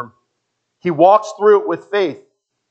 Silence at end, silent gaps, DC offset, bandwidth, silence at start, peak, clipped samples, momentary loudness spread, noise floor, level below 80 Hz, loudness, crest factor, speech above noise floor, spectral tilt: 0.55 s; none; under 0.1%; 8 kHz; 0 s; 0 dBFS; under 0.1%; 12 LU; -73 dBFS; -76 dBFS; -15 LUFS; 16 dB; 59 dB; -6 dB/octave